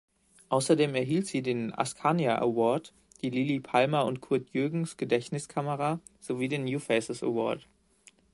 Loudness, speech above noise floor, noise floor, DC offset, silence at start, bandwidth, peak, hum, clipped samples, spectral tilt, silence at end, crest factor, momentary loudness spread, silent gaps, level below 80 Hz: -29 LUFS; 32 dB; -61 dBFS; under 0.1%; 0.5 s; 11.5 kHz; -8 dBFS; none; under 0.1%; -5.5 dB/octave; 0.75 s; 20 dB; 8 LU; none; -70 dBFS